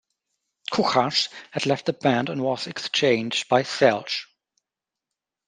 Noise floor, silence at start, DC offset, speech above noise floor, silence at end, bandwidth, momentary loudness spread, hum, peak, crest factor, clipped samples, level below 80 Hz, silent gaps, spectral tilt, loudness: -88 dBFS; 0.7 s; under 0.1%; 65 dB; 1.25 s; 9.8 kHz; 8 LU; none; -4 dBFS; 22 dB; under 0.1%; -70 dBFS; none; -4 dB/octave; -23 LUFS